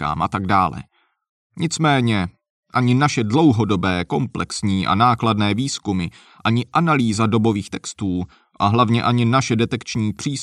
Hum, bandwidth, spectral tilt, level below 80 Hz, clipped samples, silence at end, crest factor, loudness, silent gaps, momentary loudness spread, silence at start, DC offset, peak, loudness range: none; 11 kHz; -5.5 dB/octave; -48 dBFS; under 0.1%; 0 s; 16 dB; -19 LUFS; 1.29-1.50 s, 2.50-2.63 s; 9 LU; 0 s; under 0.1%; -4 dBFS; 2 LU